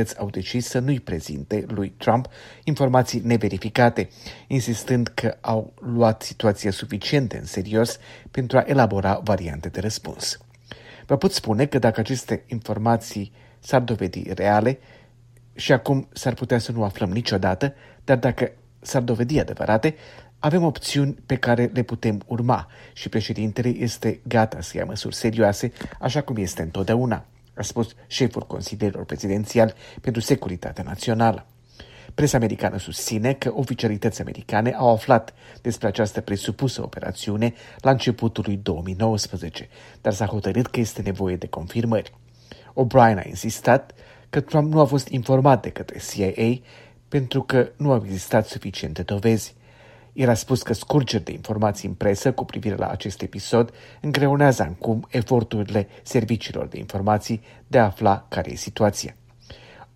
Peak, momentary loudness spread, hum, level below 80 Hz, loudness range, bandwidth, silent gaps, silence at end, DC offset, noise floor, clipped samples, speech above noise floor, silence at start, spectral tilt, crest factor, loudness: -2 dBFS; 11 LU; none; -48 dBFS; 3 LU; 16 kHz; none; 0.1 s; under 0.1%; -51 dBFS; under 0.1%; 29 dB; 0 s; -6 dB/octave; 22 dB; -23 LUFS